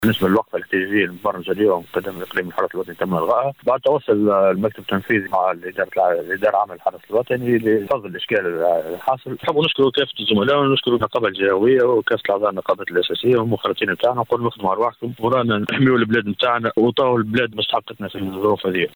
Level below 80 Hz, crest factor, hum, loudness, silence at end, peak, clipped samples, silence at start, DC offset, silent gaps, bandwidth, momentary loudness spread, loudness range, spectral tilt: -58 dBFS; 12 dB; none; -19 LUFS; 0.05 s; -6 dBFS; under 0.1%; 0 s; under 0.1%; none; over 20 kHz; 7 LU; 3 LU; -7 dB/octave